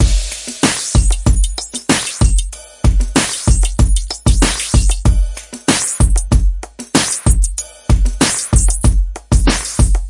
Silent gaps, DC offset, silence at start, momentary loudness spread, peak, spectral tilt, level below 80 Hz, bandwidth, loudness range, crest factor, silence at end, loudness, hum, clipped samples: none; under 0.1%; 0 s; 7 LU; 0 dBFS; -4 dB/octave; -14 dBFS; 11.5 kHz; 1 LU; 14 dB; 0 s; -15 LUFS; none; under 0.1%